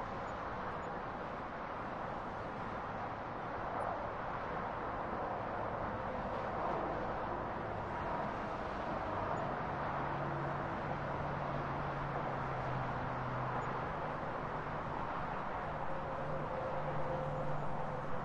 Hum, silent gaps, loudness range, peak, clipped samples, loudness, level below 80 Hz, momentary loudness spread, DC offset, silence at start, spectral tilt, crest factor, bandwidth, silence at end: none; none; 2 LU; -26 dBFS; under 0.1%; -40 LUFS; -54 dBFS; 4 LU; under 0.1%; 0 s; -7.5 dB/octave; 14 dB; 10.5 kHz; 0 s